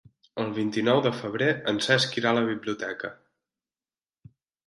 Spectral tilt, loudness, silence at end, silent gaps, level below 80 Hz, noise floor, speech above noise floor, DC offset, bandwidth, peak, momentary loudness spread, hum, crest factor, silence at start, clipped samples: -4.5 dB/octave; -26 LUFS; 1.55 s; none; -70 dBFS; under -90 dBFS; over 64 dB; under 0.1%; 11.5 kHz; -6 dBFS; 11 LU; none; 22 dB; 0.35 s; under 0.1%